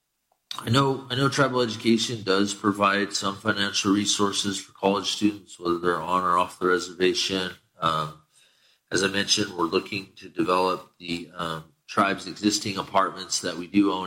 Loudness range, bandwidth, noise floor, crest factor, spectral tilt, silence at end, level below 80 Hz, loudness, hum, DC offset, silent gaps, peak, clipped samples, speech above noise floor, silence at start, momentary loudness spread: 3 LU; 16 kHz; -73 dBFS; 18 dB; -3.5 dB/octave; 0 s; -62 dBFS; -25 LUFS; none; under 0.1%; none; -6 dBFS; under 0.1%; 48 dB; 0.5 s; 10 LU